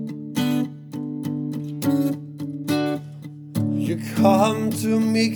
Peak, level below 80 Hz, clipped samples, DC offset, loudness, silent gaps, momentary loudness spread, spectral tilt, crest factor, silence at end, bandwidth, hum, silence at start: -4 dBFS; -72 dBFS; under 0.1%; under 0.1%; -23 LUFS; none; 12 LU; -6 dB/octave; 18 dB; 0 s; over 20 kHz; none; 0 s